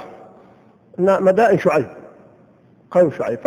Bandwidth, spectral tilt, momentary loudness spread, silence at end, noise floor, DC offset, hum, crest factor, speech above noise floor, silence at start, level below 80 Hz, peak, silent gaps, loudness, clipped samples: 11 kHz; -7.5 dB/octave; 18 LU; 0 s; -51 dBFS; under 0.1%; none; 16 dB; 36 dB; 0 s; -60 dBFS; -2 dBFS; none; -17 LUFS; under 0.1%